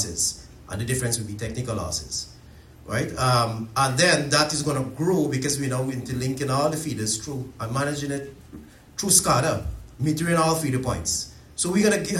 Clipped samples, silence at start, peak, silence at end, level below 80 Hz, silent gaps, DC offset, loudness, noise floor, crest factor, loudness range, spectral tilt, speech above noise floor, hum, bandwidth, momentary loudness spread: under 0.1%; 0 s; -2 dBFS; 0 s; -46 dBFS; none; under 0.1%; -24 LUFS; -47 dBFS; 22 dB; 5 LU; -4 dB/octave; 23 dB; none; 16.5 kHz; 13 LU